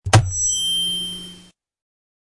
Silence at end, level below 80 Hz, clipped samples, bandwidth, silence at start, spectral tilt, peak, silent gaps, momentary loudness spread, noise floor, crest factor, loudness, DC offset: 0.9 s; -42 dBFS; under 0.1%; 11.5 kHz; 0.05 s; -2.5 dB/octave; -2 dBFS; none; 15 LU; -48 dBFS; 20 dB; -19 LUFS; under 0.1%